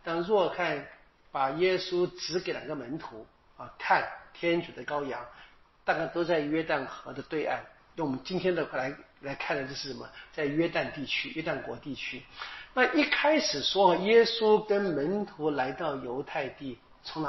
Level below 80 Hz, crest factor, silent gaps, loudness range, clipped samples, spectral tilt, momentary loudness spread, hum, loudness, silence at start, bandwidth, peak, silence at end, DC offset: -62 dBFS; 20 dB; none; 8 LU; under 0.1%; -2.5 dB/octave; 16 LU; none; -29 LUFS; 0.05 s; 6 kHz; -10 dBFS; 0 s; under 0.1%